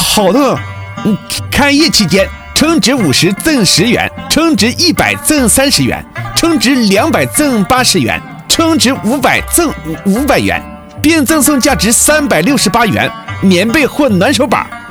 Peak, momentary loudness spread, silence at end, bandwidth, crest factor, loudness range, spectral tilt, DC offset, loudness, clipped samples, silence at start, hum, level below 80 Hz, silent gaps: 0 dBFS; 8 LU; 0 s; over 20 kHz; 10 dB; 1 LU; -3.5 dB/octave; under 0.1%; -10 LUFS; 0.2%; 0 s; none; -32 dBFS; none